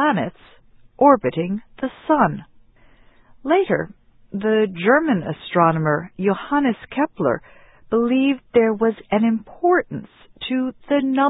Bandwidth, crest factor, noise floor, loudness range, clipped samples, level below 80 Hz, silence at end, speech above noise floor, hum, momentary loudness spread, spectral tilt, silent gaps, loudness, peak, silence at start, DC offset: 4 kHz; 20 dB; -50 dBFS; 2 LU; under 0.1%; -56 dBFS; 0 s; 31 dB; none; 11 LU; -11.5 dB/octave; none; -20 LUFS; -2 dBFS; 0 s; under 0.1%